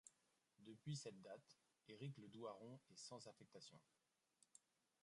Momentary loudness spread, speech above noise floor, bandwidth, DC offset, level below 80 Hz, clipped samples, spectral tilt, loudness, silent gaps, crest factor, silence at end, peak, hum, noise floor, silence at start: 12 LU; 27 dB; 11 kHz; under 0.1%; under -90 dBFS; under 0.1%; -5 dB/octave; -58 LUFS; none; 20 dB; 0.45 s; -40 dBFS; none; -85 dBFS; 0.05 s